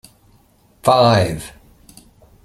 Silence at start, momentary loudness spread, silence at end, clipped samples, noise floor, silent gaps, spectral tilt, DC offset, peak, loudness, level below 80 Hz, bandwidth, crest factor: 0.85 s; 18 LU; 0.95 s; under 0.1%; -54 dBFS; none; -5.5 dB/octave; under 0.1%; -2 dBFS; -15 LUFS; -46 dBFS; 15.5 kHz; 18 dB